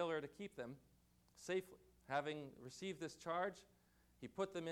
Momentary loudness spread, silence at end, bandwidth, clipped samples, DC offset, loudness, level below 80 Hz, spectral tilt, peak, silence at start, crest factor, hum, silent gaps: 16 LU; 0 s; 18 kHz; under 0.1%; under 0.1%; -47 LUFS; -78 dBFS; -5 dB/octave; -28 dBFS; 0 s; 18 dB; 60 Hz at -75 dBFS; none